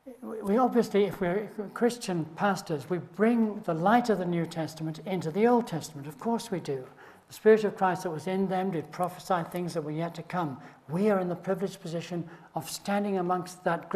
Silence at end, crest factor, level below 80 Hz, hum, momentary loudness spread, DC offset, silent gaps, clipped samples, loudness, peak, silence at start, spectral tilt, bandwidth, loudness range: 0 s; 20 dB; -68 dBFS; none; 12 LU; under 0.1%; none; under 0.1%; -29 LUFS; -10 dBFS; 0.05 s; -6 dB/octave; 13.5 kHz; 4 LU